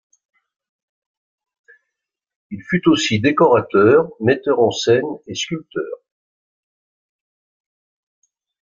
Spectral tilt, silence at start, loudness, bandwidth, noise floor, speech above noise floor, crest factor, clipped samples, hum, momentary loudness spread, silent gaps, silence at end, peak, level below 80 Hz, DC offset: -5 dB/octave; 2.5 s; -17 LUFS; 7.6 kHz; -82 dBFS; 65 dB; 18 dB; under 0.1%; none; 15 LU; none; 2.65 s; -2 dBFS; -58 dBFS; under 0.1%